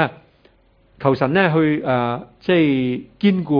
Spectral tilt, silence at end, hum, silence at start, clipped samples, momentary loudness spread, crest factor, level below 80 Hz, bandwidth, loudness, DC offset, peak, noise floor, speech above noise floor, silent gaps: -9.5 dB/octave; 0 s; none; 0 s; under 0.1%; 8 LU; 18 dB; -54 dBFS; 5.2 kHz; -19 LUFS; under 0.1%; 0 dBFS; -55 dBFS; 38 dB; none